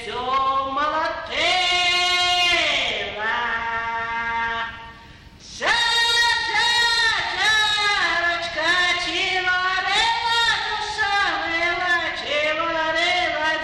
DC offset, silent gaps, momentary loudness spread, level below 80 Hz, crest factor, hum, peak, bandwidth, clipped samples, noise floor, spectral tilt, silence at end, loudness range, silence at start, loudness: under 0.1%; none; 8 LU; -48 dBFS; 12 dB; none; -10 dBFS; 14.5 kHz; under 0.1%; -44 dBFS; -1 dB/octave; 0 s; 4 LU; 0 s; -19 LUFS